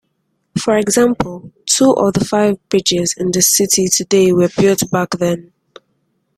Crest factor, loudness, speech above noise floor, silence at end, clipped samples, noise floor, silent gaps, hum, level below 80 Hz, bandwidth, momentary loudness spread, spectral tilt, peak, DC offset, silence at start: 16 dB; -14 LUFS; 53 dB; 0.95 s; under 0.1%; -67 dBFS; none; none; -48 dBFS; 16 kHz; 10 LU; -3.5 dB/octave; 0 dBFS; under 0.1%; 0.55 s